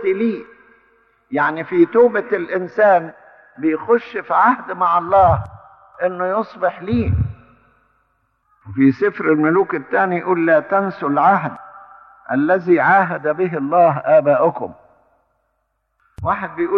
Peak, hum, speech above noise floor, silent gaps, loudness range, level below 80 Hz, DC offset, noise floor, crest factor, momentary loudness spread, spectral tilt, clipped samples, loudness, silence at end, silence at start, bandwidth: -2 dBFS; none; 53 dB; none; 4 LU; -42 dBFS; under 0.1%; -69 dBFS; 16 dB; 10 LU; -10 dB/octave; under 0.1%; -17 LUFS; 0 s; 0 s; 5.8 kHz